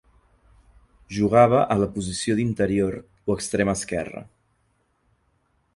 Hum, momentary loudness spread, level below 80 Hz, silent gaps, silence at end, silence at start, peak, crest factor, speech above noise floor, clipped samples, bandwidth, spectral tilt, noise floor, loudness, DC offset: none; 14 LU; -48 dBFS; none; 1.5 s; 1.1 s; -4 dBFS; 22 dB; 46 dB; under 0.1%; 11.5 kHz; -5.5 dB/octave; -68 dBFS; -23 LUFS; under 0.1%